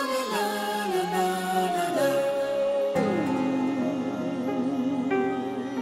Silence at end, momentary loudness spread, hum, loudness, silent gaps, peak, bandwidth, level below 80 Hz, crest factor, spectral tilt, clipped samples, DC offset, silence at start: 0 s; 4 LU; none; -27 LUFS; none; -12 dBFS; 16 kHz; -66 dBFS; 14 dB; -5 dB/octave; under 0.1%; under 0.1%; 0 s